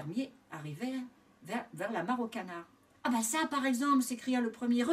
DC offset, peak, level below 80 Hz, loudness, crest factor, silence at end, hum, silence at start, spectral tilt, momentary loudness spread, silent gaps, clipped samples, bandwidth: under 0.1%; -18 dBFS; -80 dBFS; -34 LUFS; 16 dB; 0 s; none; 0 s; -4 dB/octave; 14 LU; none; under 0.1%; 16 kHz